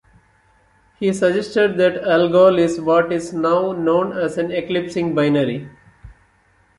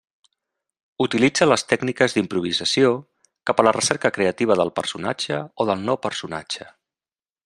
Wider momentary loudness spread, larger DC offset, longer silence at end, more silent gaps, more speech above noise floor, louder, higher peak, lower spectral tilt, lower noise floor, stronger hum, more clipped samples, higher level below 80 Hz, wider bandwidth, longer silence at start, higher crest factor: about the same, 9 LU vs 11 LU; neither; second, 0.65 s vs 0.85 s; neither; second, 40 dB vs over 69 dB; first, -18 LUFS vs -21 LUFS; about the same, -2 dBFS vs 0 dBFS; first, -6 dB/octave vs -4 dB/octave; second, -57 dBFS vs under -90 dBFS; neither; neither; first, -54 dBFS vs -62 dBFS; about the same, 11.5 kHz vs 12.5 kHz; about the same, 1 s vs 1 s; second, 16 dB vs 22 dB